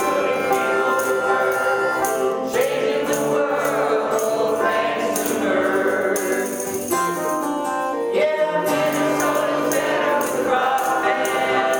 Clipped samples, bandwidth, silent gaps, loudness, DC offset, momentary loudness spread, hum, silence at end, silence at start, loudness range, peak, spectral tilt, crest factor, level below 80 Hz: under 0.1%; 18 kHz; none; -20 LUFS; under 0.1%; 3 LU; none; 0 s; 0 s; 2 LU; -4 dBFS; -3.5 dB/octave; 14 dB; -62 dBFS